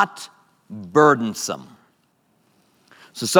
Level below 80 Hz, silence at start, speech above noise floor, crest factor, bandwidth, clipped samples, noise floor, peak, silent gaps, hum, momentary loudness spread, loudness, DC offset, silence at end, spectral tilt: -72 dBFS; 0 s; 44 dB; 22 dB; 19 kHz; under 0.1%; -64 dBFS; 0 dBFS; none; none; 24 LU; -20 LUFS; under 0.1%; 0 s; -4 dB/octave